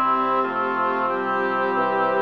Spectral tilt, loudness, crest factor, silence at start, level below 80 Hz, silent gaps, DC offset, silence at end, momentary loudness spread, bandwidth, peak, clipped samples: -7 dB/octave; -22 LUFS; 12 dB; 0 s; -70 dBFS; none; 0.2%; 0 s; 2 LU; 6.6 kHz; -10 dBFS; under 0.1%